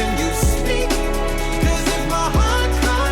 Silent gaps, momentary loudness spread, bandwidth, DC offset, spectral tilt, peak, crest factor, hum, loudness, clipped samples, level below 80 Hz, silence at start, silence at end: none; 4 LU; 17.5 kHz; under 0.1%; -4.5 dB/octave; -8 dBFS; 10 dB; none; -19 LUFS; under 0.1%; -20 dBFS; 0 s; 0 s